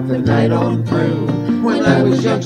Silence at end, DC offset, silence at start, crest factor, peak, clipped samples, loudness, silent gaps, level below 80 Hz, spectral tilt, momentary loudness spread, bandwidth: 0 s; under 0.1%; 0 s; 14 dB; 0 dBFS; under 0.1%; -15 LUFS; none; -46 dBFS; -7.5 dB/octave; 4 LU; 9.8 kHz